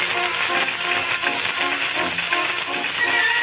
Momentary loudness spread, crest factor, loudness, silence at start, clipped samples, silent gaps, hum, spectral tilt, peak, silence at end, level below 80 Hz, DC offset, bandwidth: 3 LU; 16 dB; -20 LUFS; 0 s; under 0.1%; none; none; 1 dB/octave; -6 dBFS; 0 s; -60 dBFS; under 0.1%; 4 kHz